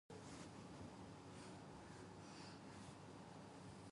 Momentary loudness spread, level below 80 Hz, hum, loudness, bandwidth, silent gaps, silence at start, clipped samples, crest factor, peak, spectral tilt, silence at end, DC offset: 2 LU; -74 dBFS; none; -58 LUFS; 11.5 kHz; none; 0.1 s; under 0.1%; 14 dB; -44 dBFS; -5 dB/octave; 0 s; under 0.1%